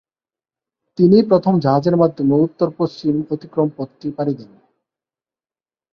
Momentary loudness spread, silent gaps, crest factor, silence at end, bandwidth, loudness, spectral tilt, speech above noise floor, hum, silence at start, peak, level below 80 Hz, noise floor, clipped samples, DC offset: 12 LU; none; 16 dB; 1.5 s; 6.6 kHz; -17 LUFS; -9.5 dB/octave; over 74 dB; none; 1 s; -2 dBFS; -58 dBFS; under -90 dBFS; under 0.1%; under 0.1%